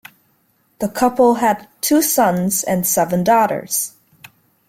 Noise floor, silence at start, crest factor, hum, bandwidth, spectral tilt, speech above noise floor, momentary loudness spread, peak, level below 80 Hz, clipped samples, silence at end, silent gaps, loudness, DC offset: -61 dBFS; 0.8 s; 16 dB; none; 16.5 kHz; -4 dB/octave; 45 dB; 7 LU; -2 dBFS; -56 dBFS; under 0.1%; 0.8 s; none; -16 LUFS; under 0.1%